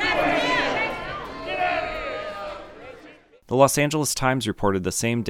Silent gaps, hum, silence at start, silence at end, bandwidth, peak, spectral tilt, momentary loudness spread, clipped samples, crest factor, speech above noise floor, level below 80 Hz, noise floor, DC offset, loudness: none; none; 0 s; 0 s; 17.5 kHz; -2 dBFS; -4 dB/octave; 16 LU; under 0.1%; 22 dB; 27 dB; -46 dBFS; -49 dBFS; under 0.1%; -23 LUFS